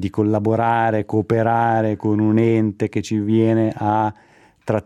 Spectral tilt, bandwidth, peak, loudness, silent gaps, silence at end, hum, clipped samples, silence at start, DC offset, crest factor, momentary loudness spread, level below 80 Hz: -8 dB/octave; 10 kHz; -2 dBFS; -19 LUFS; none; 0.05 s; none; under 0.1%; 0 s; under 0.1%; 16 dB; 6 LU; -58 dBFS